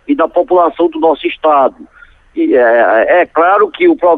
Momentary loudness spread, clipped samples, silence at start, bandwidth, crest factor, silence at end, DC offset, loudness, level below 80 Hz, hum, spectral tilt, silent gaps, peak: 5 LU; under 0.1%; 0.1 s; 4 kHz; 10 dB; 0 s; under 0.1%; -10 LUFS; -50 dBFS; none; -7 dB/octave; none; -2 dBFS